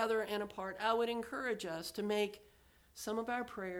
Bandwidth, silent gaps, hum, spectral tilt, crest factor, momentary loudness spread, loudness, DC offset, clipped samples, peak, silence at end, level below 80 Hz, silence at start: 20 kHz; none; none; -4 dB/octave; 18 dB; 8 LU; -38 LUFS; under 0.1%; under 0.1%; -20 dBFS; 0 s; -70 dBFS; 0 s